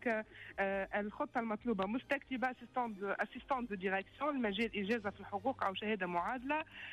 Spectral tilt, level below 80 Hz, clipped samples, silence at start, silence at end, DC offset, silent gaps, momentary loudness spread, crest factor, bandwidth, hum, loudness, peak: -6.5 dB/octave; -66 dBFS; under 0.1%; 0 s; 0 s; under 0.1%; none; 4 LU; 14 dB; 12.5 kHz; none; -39 LUFS; -24 dBFS